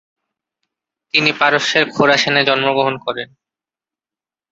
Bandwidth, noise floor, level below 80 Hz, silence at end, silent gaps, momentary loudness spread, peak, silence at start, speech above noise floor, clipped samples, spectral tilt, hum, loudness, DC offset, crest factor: 7.8 kHz; under -90 dBFS; -62 dBFS; 1.25 s; none; 11 LU; -2 dBFS; 1.15 s; over 75 dB; under 0.1%; -3.5 dB/octave; none; -14 LUFS; under 0.1%; 18 dB